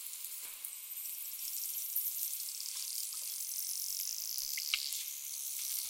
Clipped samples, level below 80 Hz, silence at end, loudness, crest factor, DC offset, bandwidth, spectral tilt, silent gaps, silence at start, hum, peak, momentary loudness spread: under 0.1%; -84 dBFS; 0 s; -37 LUFS; 28 dB; under 0.1%; 17 kHz; 6 dB/octave; none; 0 s; none; -12 dBFS; 7 LU